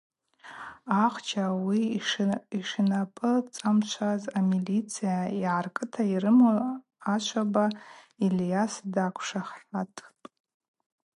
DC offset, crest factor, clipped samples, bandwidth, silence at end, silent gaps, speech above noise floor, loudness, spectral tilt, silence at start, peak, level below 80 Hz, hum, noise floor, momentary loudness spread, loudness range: under 0.1%; 18 dB; under 0.1%; 11.5 kHz; 1.1 s; none; 22 dB; -28 LUFS; -5.5 dB/octave; 0.45 s; -10 dBFS; -74 dBFS; none; -49 dBFS; 10 LU; 4 LU